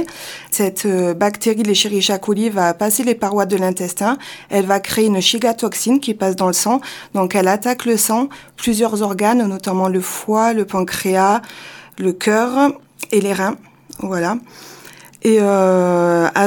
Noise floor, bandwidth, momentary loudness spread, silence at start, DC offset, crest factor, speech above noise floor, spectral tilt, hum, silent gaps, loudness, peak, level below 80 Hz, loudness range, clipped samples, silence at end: -40 dBFS; 19 kHz; 9 LU; 0 s; under 0.1%; 16 dB; 24 dB; -4 dB/octave; none; none; -17 LUFS; 0 dBFS; -58 dBFS; 2 LU; under 0.1%; 0 s